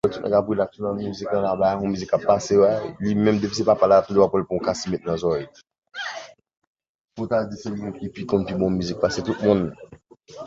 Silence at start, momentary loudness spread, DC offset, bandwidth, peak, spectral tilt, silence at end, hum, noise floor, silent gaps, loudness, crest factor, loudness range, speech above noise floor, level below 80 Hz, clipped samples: 0.05 s; 14 LU; under 0.1%; 7.8 kHz; -4 dBFS; -6 dB/octave; 0 s; none; -46 dBFS; 5.78-5.82 s, 6.57-6.75 s, 6.89-7.05 s; -22 LUFS; 18 dB; 9 LU; 24 dB; -50 dBFS; under 0.1%